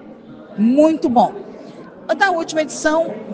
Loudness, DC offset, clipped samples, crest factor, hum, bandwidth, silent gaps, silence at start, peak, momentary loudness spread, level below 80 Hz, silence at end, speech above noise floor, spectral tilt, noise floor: -17 LUFS; under 0.1%; under 0.1%; 18 dB; none; 9.8 kHz; none; 0 s; 0 dBFS; 20 LU; -58 dBFS; 0 s; 22 dB; -4.5 dB/octave; -38 dBFS